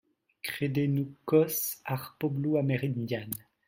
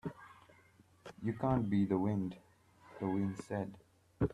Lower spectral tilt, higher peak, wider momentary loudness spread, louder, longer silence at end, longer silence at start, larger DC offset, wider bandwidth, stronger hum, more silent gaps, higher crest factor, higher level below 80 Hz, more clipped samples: second, -6 dB/octave vs -9 dB/octave; first, -12 dBFS vs -20 dBFS; second, 10 LU vs 24 LU; first, -30 LUFS vs -37 LUFS; first, 0.3 s vs 0 s; first, 0.45 s vs 0.05 s; neither; first, 16.5 kHz vs 11 kHz; neither; neither; about the same, 20 dB vs 18 dB; second, -70 dBFS vs -60 dBFS; neither